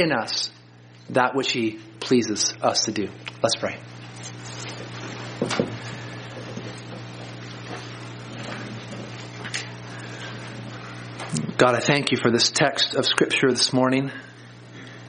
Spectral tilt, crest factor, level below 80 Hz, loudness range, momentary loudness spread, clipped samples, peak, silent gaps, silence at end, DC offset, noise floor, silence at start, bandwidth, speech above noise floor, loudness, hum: -3.5 dB/octave; 26 dB; -62 dBFS; 14 LU; 18 LU; under 0.1%; 0 dBFS; none; 0 s; under 0.1%; -48 dBFS; 0 s; 10 kHz; 26 dB; -23 LUFS; none